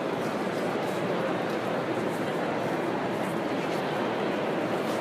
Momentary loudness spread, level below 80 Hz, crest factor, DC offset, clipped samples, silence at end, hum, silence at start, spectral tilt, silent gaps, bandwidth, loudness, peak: 1 LU; -68 dBFS; 12 dB; under 0.1%; under 0.1%; 0 s; none; 0 s; -5.5 dB/octave; none; 15.5 kHz; -29 LUFS; -16 dBFS